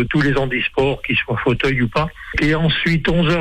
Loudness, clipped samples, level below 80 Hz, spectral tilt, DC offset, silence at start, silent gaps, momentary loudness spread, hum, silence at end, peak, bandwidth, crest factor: -18 LUFS; under 0.1%; -32 dBFS; -6.5 dB/octave; under 0.1%; 0 s; none; 4 LU; none; 0 s; -6 dBFS; 9.6 kHz; 10 dB